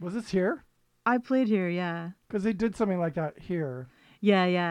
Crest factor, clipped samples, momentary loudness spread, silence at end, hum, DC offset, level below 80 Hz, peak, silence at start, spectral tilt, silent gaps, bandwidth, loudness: 18 dB; under 0.1%; 11 LU; 0 s; none; under 0.1%; -60 dBFS; -10 dBFS; 0 s; -7.5 dB/octave; none; 10.5 kHz; -28 LUFS